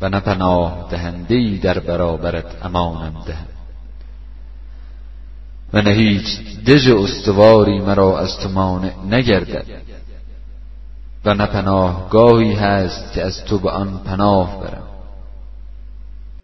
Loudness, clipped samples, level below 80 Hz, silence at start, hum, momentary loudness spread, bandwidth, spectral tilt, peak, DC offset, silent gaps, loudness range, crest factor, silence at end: -16 LUFS; under 0.1%; -32 dBFS; 0 s; 50 Hz at -35 dBFS; 19 LU; 6.2 kHz; -7 dB/octave; 0 dBFS; 1%; none; 9 LU; 16 dB; 0 s